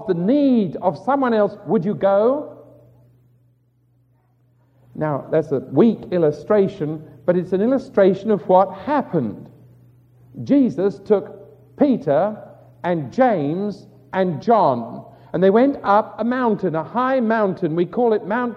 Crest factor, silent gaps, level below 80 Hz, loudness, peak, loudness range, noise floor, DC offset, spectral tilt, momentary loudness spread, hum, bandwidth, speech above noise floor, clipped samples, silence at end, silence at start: 18 dB; none; -62 dBFS; -19 LUFS; -2 dBFS; 5 LU; -60 dBFS; under 0.1%; -9 dB/octave; 11 LU; none; 7 kHz; 42 dB; under 0.1%; 0 s; 0 s